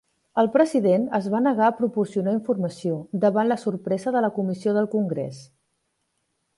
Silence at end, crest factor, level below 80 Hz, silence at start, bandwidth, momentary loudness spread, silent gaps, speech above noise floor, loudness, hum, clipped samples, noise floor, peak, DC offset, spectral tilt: 1.15 s; 18 dB; -70 dBFS; 0.35 s; 11.5 kHz; 8 LU; none; 52 dB; -23 LUFS; none; under 0.1%; -74 dBFS; -6 dBFS; under 0.1%; -7.5 dB/octave